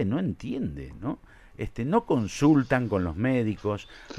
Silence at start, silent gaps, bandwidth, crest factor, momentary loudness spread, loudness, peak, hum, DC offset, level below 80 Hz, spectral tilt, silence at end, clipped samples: 0 s; none; 12 kHz; 18 dB; 14 LU; -27 LUFS; -8 dBFS; none; under 0.1%; -48 dBFS; -7 dB/octave; 0 s; under 0.1%